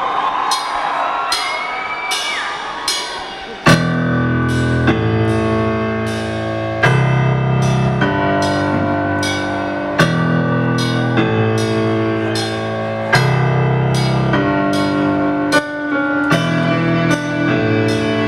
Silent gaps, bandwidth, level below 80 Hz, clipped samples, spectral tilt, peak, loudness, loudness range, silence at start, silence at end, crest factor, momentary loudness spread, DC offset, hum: none; 13.5 kHz; -40 dBFS; under 0.1%; -5.5 dB/octave; 0 dBFS; -16 LUFS; 2 LU; 0 s; 0 s; 16 dB; 6 LU; under 0.1%; none